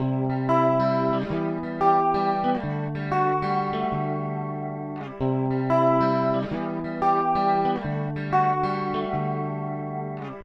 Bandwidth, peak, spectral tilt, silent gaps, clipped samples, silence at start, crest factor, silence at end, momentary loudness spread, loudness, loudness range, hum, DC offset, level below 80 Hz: 7 kHz; -8 dBFS; -9 dB/octave; none; under 0.1%; 0 s; 16 dB; 0 s; 10 LU; -25 LUFS; 3 LU; none; under 0.1%; -52 dBFS